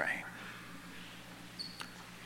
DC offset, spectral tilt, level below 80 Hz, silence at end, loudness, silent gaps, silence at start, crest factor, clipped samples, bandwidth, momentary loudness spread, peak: under 0.1%; -3 dB/octave; -68 dBFS; 0 s; -45 LUFS; none; 0 s; 26 dB; under 0.1%; 18 kHz; 9 LU; -20 dBFS